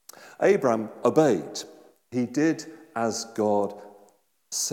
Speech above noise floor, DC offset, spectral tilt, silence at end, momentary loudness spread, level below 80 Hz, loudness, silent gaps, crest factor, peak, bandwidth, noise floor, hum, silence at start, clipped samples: 37 dB; under 0.1%; -4.5 dB/octave; 0 s; 15 LU; -80 dBFS; -26 LUFS; none; 20 dB; -6 dBFS; 17.5 kHz; -61 dBFS; none; 0.2 s; under 0.1%